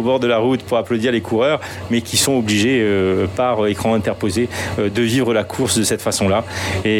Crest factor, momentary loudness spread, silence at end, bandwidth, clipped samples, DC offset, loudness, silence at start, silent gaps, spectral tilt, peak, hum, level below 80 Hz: 14 dB; 5 LU; 0 s; 18 kHz; under 0.1%; under 0.1%; -17 LUFS; 0 s; none; -4.5 dB/octave; -2 dBFS; none; -50 dBFS